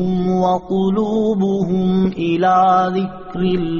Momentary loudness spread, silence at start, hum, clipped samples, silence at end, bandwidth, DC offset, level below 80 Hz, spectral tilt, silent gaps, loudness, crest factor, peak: 6 LU; 0 s; none; under 0.1%; 0 s; 7 kHz; under 0.1%; -44 dBFS; -6.5 dB/octave; none; -17 LUFS; 12 dB; -4 dBFS